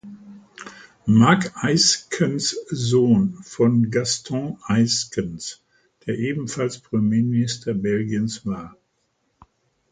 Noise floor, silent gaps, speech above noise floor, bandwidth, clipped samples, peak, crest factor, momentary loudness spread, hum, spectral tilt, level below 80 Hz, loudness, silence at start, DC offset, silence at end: -70 dBFS; none; 49 dB; 9.4 kHz; under 0.1%; 0 dBFS; 22 dB; 16 LU; none; -4.5 dB/octave; -54 dBFS; -21 LUFS; 0.05 s; under 0.1%; 1.2 s